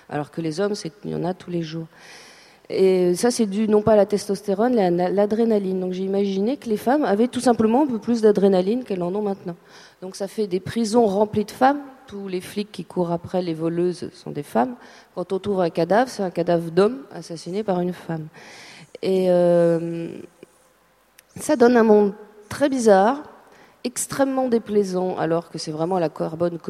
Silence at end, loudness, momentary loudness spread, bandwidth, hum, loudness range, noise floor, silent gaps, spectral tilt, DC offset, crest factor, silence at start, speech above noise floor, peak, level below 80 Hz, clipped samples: 0 s; -21 LUFS; 16 LU; 14.5 kHz; none; 4 LU; -59 dBFS; none; -6 dB/octave; under 0.1%; 20 dB; 0.1 s; 38 dB; -2 dBFS; -62 dBFS; under 0.1%